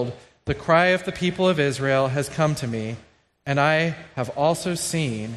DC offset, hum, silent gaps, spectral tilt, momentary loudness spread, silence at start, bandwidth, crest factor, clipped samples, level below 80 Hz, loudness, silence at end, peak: under 0.1%; none; none; -5 dB/octave; 12 LU; 0 s; 13.5 kHz; 18 dB; under 0.1%; -52 dBFS; -22 LUFS; 0 s; -4 dBFS